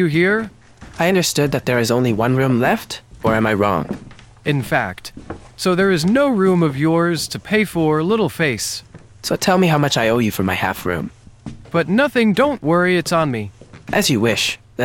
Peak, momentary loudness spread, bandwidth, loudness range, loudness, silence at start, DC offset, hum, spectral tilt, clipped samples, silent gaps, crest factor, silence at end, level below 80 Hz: -2 dBFS; 14 LU; 18 kHz; 2 LU; -17 LUFS; 0 s; under 0.1%; none; -5 dB/octave; under 0.1%; none; 16 dB; 0 s; -46 dBFS